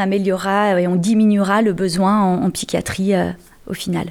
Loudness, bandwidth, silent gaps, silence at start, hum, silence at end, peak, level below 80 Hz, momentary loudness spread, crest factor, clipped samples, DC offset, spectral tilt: -17 LUFS; 15.5 kHz; none; 0 s; none; 0 s; -4 dBFS; -48 dBFS; 9 LU; 12 dB; under 0.1%; under 0.1%; -6 dB/octave